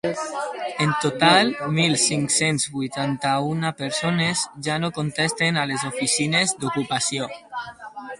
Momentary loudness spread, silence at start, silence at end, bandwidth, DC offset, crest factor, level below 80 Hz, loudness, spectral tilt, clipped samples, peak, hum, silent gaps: 10 LU; 0.05 s; 0.05 s; 11.5 kHz; under 0.1%; 22 dB; -60 dBFS; -22 LUFS; -3.5 dB/octave; under 0.1%; -2 dBFS; none; none